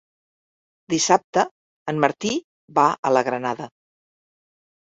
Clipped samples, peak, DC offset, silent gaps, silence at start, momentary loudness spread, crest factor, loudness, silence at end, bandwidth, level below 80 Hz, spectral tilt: under 0.1%; -2 dBFS; under 0.1%; 1.24-1.33 s, 1.51-1.86 s, 2.44-2.68 s, 2.98-3.03 s; 0.9 s; 11 LU; 22 dB; -22 LUFS; 1.3 s; 8.4 kHz; -66 dBFS; -3.5 dB/octave